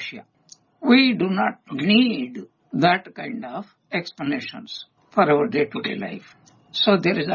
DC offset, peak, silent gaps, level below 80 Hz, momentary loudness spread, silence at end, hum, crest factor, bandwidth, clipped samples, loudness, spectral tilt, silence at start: under 0.1%; -4 dBFS; none; -66 dBFS; 17 LU; 0 s; none; 20 dB; 7 kHz; under 0.1%; -21 LUFS; -6.5 dB/octave; 0 s